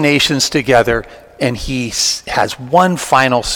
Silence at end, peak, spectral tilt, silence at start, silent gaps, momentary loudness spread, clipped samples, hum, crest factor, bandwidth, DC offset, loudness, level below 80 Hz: 0 s; 0 dBFS; -3.5 dB/octave; 0 s; none; 8 LU; 0.4%; none; 14 dB; 18.5 kHz; under 0.1%; -14 LUFS; -36 dBFS